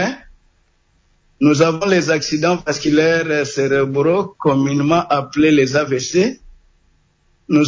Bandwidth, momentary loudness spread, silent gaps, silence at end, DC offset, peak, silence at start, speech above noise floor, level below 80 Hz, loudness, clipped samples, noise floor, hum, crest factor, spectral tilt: 7.6 kHz; 5 LU; none; 0 s; under 0.1%; -2 dBFS; 0 s; 43 dB; -50 dBFS; -16 LUFS; under 0.1%; -59 dBFS; none; 14 dB; -5.5 dB/octave